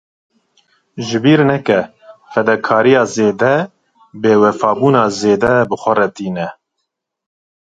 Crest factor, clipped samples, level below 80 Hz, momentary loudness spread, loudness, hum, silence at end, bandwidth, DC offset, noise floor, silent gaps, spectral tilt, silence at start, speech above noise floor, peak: 14 dB; under 0.1%; -52 dBFS; 12 LU; -14 LUFS; none; 1.25 s; 9 kHz; under 0.1%; -74 dBFS; none; -6 dB/octave; 0.95 s; 61 dB; 0 dBFS